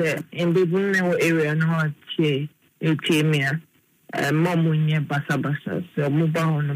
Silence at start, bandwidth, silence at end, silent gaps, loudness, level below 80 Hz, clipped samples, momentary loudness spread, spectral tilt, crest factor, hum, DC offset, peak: 0 s; 15.5 kHz; 0 s; none; -22 LUFS; -68 dBFS; under 0.1%; 7 LU; -6.5 dB/octave; 14 dB; none; under 0.1%; -8 dBFS